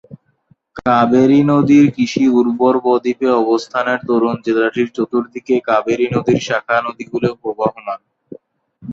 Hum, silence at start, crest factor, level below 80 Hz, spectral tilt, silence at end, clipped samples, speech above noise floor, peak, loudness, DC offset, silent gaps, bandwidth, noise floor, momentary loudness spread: none; 0.1 s; 14 dB; -54 dBFS; -6.5 dB/octave; 0 s; under 0.1%; 42 dB; -2 dBFS; -15 LUFS; under 0.1%; none; 7.6 kHz; -56 dBFS; 9 LU